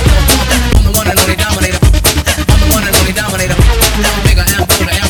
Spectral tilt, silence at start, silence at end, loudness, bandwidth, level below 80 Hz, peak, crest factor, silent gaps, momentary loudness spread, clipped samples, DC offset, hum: -3.5 dB/octave; 0 s; 0 s; -10 LUFS; over 20 kHz; -12 dBFS; 0 dBFS; 10 dB; none; 3 LU; 0.2%; under 0.1%; none